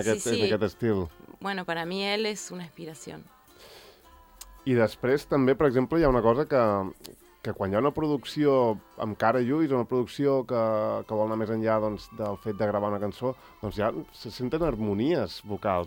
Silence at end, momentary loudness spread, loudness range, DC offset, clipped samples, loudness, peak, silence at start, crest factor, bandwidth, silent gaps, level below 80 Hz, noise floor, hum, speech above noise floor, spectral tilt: 0 s; 14 LU; 7 LU; under 0.1%; under 0.1%; -27 LUFS; -8 dBFS; 0 s; 18 dB; 18 kHz; none; -50 dBFS; -54 dBFS; none; 27 dB; -6 dB/octave